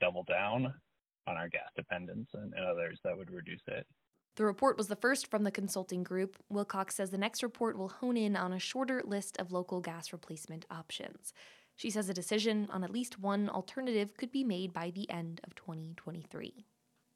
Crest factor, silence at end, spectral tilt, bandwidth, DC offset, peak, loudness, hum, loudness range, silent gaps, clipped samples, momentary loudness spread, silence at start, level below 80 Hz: 22 dB; 0.55 s; -4.5 dB/octave; 15 kHz; under 0.1%; -16 dBFS; -37 LUFS; none; 5 LU; none; under 0.1%; 14 LU; 0 s; -76 dBFS